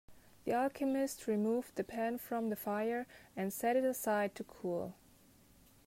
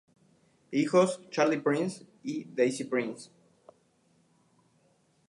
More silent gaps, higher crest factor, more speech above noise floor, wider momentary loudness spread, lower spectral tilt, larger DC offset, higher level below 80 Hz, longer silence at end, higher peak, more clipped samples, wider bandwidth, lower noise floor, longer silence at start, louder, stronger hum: neither; about the same, 16 dB vs 20 dB; second, 28 dB vs 40 dB; second, 8 LU vs 13 LU; about the same, -5.5 dB/octave vs -5.5 dB/octave; neither; first, -72 dBFS vs -80 dBFS; second, 0.95 s vs 2.05 s; second, -22 dBFS vs -12 dBFS; neither; first, 16 kHz vs 11.5 kHz; second, -64 dBFS vs -68 dBFS; second, 0.1 s vs 0.7 s; second, -37 LUFS vs -29 LUFS; neither